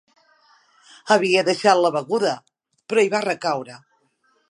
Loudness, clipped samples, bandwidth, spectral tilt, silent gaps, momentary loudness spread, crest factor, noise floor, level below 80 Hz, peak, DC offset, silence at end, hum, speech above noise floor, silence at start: -20 LUFS; under 0.1%; 11.5 kHz; -4 dB/octave; none; 13 LU; 20 dB; -65 dBFS; -78 dBFS; -2 dBFS; under 0.1%; 0.75 s; none; 46 dB; 1.05 s